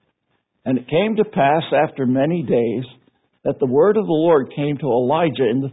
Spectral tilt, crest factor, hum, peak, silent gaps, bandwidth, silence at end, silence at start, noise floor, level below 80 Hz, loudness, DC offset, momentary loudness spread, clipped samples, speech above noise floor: -12 dB/octave; 14 dB; none; -4 dBFS; none; 4 kHz; 0 s; 0.65 s; -70 dBFS; -60 dBFS; -18 LUFS; under 0.1%; 8 LU; under 0.1%; 52 dB